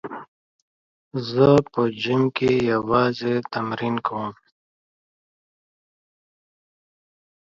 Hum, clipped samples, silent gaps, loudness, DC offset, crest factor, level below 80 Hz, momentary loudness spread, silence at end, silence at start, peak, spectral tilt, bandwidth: none; under 0.1%; 0.28-1.11 s; -21 LUFS; under 0.1%; 22 dB; -58 dBFS; 15 LU; 3.2 s; 0.05 s; -4 dBFS; -7.5 dB/octave; 7.6 kHz